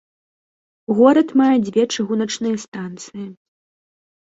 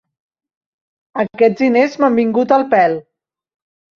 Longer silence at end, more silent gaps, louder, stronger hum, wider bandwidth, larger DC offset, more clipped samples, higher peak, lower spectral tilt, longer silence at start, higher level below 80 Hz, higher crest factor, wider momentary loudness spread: about the same, 0.9 s vs 0.95 s; first, 2.68-2.72 s vs none; second, -17 LUFS vs -14 LUFS; neither; first, 8 kHz vs 7 kHz; neither; neither; about the same, -2 dBFS vs -2 dBFS; second, -5 dB/octave vs -7 dB/octave; second, 0.9 s vs 1.15 s; about the same, -64 dBFS vs -64 dBFS; about the same, 18 dB vs 16 dB; first, 20 LU vs 10 LU